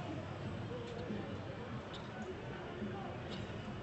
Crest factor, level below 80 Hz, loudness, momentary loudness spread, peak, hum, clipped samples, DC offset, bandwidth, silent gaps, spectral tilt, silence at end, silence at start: 14 dB; -62 dBFS; -45 LUFS; 2 LU; -30 dBFS; none; under 0.1%; under 0.1%; 8.2 kHz; none; -6.5 dB/octave; 0 s; 0 s